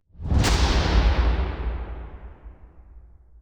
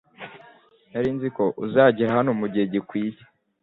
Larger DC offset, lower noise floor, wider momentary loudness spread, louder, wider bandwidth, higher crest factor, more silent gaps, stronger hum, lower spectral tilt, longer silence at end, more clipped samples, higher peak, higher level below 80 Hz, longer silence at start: neither; second, -47 dBFS vs -53 dBFS; first, 21 LU vs 18 LU; about the same, -23 LUFS vs -23 LUFS; first, 12.5 kHz vs 4.5 kHz; about the same, 16 dB vs 20 dB; neither; neither; second, -5 dB/octave vs -9.5 dB/octave; about the same, 0.4 s vs 0.5 s; neither; second, -8 dBFS vs -4 dBFS; first, -24 dBFS vs -62 dBFS; about the same, 0.2 s vs 0.2 s